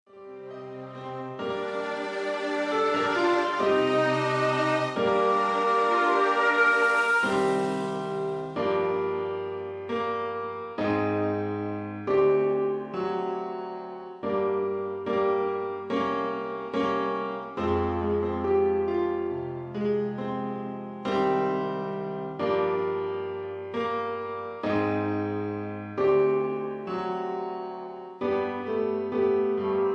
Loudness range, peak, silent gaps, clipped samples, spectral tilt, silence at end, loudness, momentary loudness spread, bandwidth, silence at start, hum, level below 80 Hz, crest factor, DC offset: 6 LU; -12 dBFS; none; under 0.1%; -6.5 dB/octave; 0 s; -27 LUFS; 11 LU; 11 kHz; 0.15 s; none; -58 dBFS; 16 dB; under 0.1%